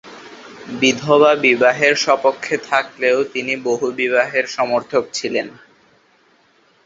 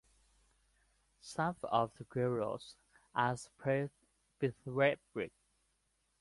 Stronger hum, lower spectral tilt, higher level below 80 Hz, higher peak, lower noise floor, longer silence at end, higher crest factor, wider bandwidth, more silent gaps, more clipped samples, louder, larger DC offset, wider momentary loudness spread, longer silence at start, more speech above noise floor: neither; second, -3.5 dB/octave vs -6 dB/octave; first, -62 dBFS vs -72 dBFS; first, 0 dBFS vs -18 dBFS; second, -56 dBFS vs -79 dBFS; first, 1.35 s vs 0.9 s; about the same, 18 dB vs 22 dB; second, 7.8 kHz vs 11.5 kHz; neither; neither; first, -16 LUFS vs -37 LUFS; neither; first, 16 LU vs 13 LU; second, 0.05 s vs 1.25 s; second, 39 dB vs 43 dB